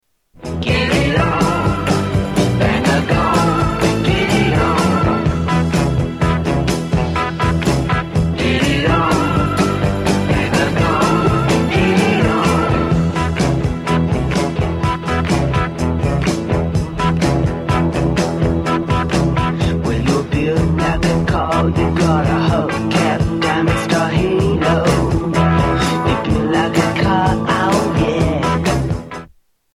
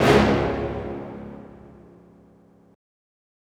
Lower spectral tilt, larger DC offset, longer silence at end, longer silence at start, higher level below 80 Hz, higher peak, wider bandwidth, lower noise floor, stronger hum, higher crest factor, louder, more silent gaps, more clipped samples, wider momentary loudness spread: about the same, -6 dB/octave vs -6 dB/octave; neither; second, 0.5 s vs 1.8 s; first, 0.4 s vs 0 s; first, -28 dBFS vs -40 dBFS; about the same, 0 dBFS vs -2 dBFS; second, 13 kHz vs 18 kHz; second, -46 dBFS vs -54 dBFS; neither; second, 14 dB vs 24 dB; first, -16 LUFS vs -23 LUFS; neither; neither; second, 4 LU vs 26 LU